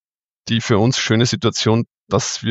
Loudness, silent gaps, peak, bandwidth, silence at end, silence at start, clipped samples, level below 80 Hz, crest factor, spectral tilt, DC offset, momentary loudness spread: -18 LUFS; 2.00-2.07 s; 0 dBFS; 8.2 kHz; 0 s; 0.45 s; under 0.1%; -50 dBFS; 18 dB; -4.5 dB/octave; under 0.1%; 6 LU